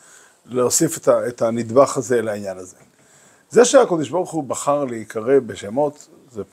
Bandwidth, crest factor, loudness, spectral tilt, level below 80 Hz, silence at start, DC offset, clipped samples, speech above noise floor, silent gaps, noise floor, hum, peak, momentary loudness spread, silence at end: 16 kHz; 20 dB; -19 LUFS; -4 dB/octave; -66 dBFS; 0.5 s; under 0.1%; under 0.1%; 34 dB; none; -52 dBFS; none; 0 dBFS; 13 LU; 0.1 s